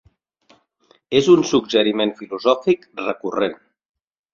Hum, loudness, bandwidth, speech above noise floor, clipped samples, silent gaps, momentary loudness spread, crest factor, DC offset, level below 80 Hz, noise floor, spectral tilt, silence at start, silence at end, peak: none; -19 LUFS; 7.4 kHz; 41 dB; under 0.1%; none; 10 LU; 18 dB; under 0.1%; -60 dBFS; -59 dBFS; -5 dB/octave; 1.1 s; 0.8 s; -2 dBFS